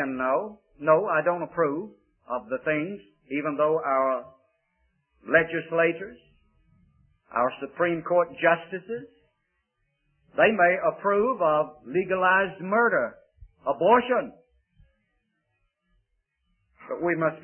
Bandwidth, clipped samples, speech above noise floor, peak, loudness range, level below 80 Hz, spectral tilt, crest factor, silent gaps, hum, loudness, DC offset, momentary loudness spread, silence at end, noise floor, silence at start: 3.3 kHz; under 0.1%; 51 dB; -6 dBFS; 5 LU; -64 dBFS; -10 dB/octave; 22 dB; none; none; -25 LUFS; under 0.1%; 13 LU; 0.05 s; -76 dBFS; 0 s